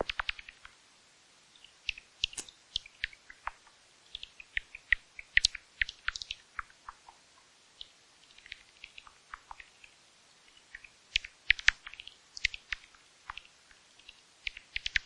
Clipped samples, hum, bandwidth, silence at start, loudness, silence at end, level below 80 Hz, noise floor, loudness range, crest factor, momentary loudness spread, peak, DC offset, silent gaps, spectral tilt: under 0.1%; none; 11.5 kHz; 0 s; -34 LUFS; 0.05 s; -56 dBFS; -62 dBFS; 18 LU; 30 dB; 24 LU; -8 dBFS; under 0.1%; none; 0.5 dB/octave